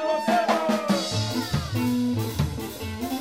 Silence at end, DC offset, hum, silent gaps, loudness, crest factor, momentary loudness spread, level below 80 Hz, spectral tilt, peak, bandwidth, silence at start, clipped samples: 0 s; 0.1%; none; none; -25 LUFS; 16 dB; 8 LU; -44 dBFS; -5.5 dB/octave; -10 dBFS; 16 kHz; 0 s; under 0.1%